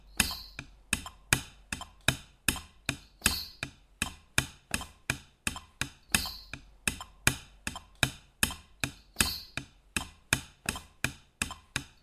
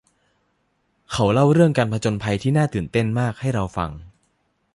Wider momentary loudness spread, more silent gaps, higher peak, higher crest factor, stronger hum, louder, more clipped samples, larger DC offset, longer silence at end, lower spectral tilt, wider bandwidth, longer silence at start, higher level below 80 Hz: about the same, 11 LU vs 12 LU; neither; about the same, -6 dBFS vs -4 dBFS; first, 30 dB vs 18 dB; neither; second, -33 LUFS vs -21 LUFS; neither; neither; second, 0.15 s vs 0.65 s; second, -2 dB/octave vs -7 dB/octave; first, 15.5 kHz vs 11.5 kHz; second, 0.05 s vs 1.1 s; about the same, -48 dBFS vs -46 dBFS